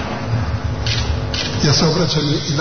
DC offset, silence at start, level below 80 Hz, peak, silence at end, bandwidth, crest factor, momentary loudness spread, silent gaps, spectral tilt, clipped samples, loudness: 2%; 0 s; -28 dBFS; -4 dBFS; 0 s; 6.6 kHz; 14 dB; 7 LU; none; -4.5 dB/octave; under 0.1%; -18 LUFS